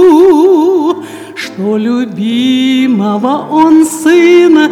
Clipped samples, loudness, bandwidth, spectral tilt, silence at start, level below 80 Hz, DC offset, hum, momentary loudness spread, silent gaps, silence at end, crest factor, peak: 1%; -8 LUFS; 14 kHz; -5 dB/octave; 0 s; -52 dBFS; under 0.1%; none; 11 LU; none; 0 s; 8 dB; 0 dBFS